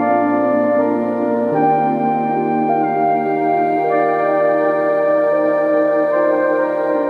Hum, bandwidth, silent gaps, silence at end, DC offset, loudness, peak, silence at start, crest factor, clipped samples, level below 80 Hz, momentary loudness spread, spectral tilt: none; 4.8 kHz; none; 0 s; under 0.1%; -16 LUFS; -4 dBFS; 0 s; 10 dB; under 0.1%; -64 dBFS; 2 LU; -9 dB/octave